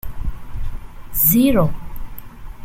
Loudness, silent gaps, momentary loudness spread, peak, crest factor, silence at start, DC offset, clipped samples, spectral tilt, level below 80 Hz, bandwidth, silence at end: -16 LUFS; none; 25 LU; -2 dBFS; 18 dB; 0.05 s; under 0.1%; under 0.1%; -6 dB/octave; -28 dBFS; 16.5 kHz; 0 s